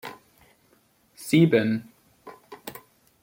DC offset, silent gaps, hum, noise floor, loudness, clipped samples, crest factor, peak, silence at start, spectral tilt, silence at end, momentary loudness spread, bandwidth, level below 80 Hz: under 0.1%; none; none; -63 dBFS; -22 LUFS; under 0.1%; 20 dB; -6 dBFS; 0.05 s; -6.5 dB/octave; 0.5 s; 25 LU; 17 kHz; -68 dBFS